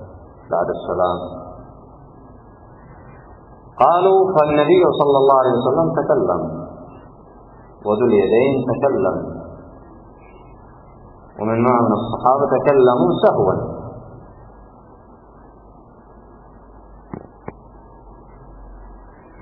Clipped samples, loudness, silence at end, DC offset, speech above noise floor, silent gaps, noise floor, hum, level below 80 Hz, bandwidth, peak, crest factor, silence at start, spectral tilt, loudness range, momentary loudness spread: under 0.1%; -16 LUFS; 0 s; under 0.1%; 29 dB; none; -44 dBFS; none; -46 dBFS; 4.1 kHz; 0 dBFS; 18 dB; 0 s; -10.5 dB/octave; 9 LU; 23 LU